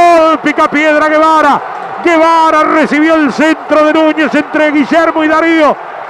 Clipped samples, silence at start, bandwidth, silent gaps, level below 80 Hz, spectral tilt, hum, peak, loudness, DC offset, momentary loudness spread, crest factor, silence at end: under 0.1%; 0 s; 11.5 kHz; none; -48 dBFS; -4.5 dB/octave; none; 0 dBFS; -8 LUFS; under 0.1%; 4 LU; 8 dB; 0 s